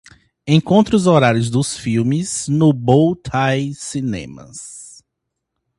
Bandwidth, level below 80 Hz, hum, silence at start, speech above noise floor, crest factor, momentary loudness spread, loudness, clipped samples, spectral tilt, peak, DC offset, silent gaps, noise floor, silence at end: 11.5 kHz; -48 dBFS; none; 0.45 s; 61 dB; 18 dB; 20 LU; -16 LUFS; under 0.1%; -6 dB/octave; 0 dBFS; under 0.1%; none; -77 dBFS; 0.9 s